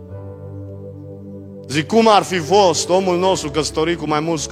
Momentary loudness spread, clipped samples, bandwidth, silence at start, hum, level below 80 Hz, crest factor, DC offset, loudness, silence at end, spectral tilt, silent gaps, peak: 21 LU; under 0.1%; 15.5 kHz; 0 s; none; -46 dBFS; 18 dB; under 0.1%; -16 LUFS; 0 s; -4 dB/octave; none; 0 dBFS